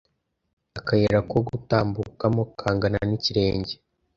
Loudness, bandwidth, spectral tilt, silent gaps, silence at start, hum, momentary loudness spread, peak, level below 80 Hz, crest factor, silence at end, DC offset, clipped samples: -24 LUFS; 7.4 kHz; -7 dB/octave; none; 0.75 s; none; 11 LU; -4 dBFS; -46 dBFS; 20 dB; 0.45 s; under 0.1%; under 0.1%